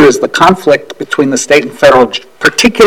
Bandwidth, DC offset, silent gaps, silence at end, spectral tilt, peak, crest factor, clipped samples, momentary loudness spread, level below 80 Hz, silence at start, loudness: 19 kHz; 0.7%; none; 0 s; -3.5 dB/octave; 0 dBFS; 8 dB; 3%; 6 LU; -40 dBFS; 0 s; -9 LUFS